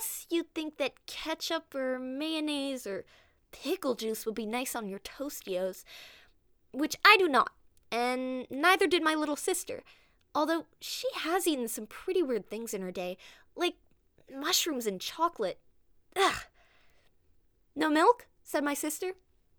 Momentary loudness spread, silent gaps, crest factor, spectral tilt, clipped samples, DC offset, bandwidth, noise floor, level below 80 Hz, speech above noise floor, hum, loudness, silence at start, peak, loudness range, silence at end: 15 LU; none; 26 dB; -2 dB/octave; under 0.1%; under 0.1%; over 20 kHz; -66 dBFS; -68 dBFS; 35 dB; none; -31 LUFS; 0 s; -6 dBFS; 9 LU; 0.45 s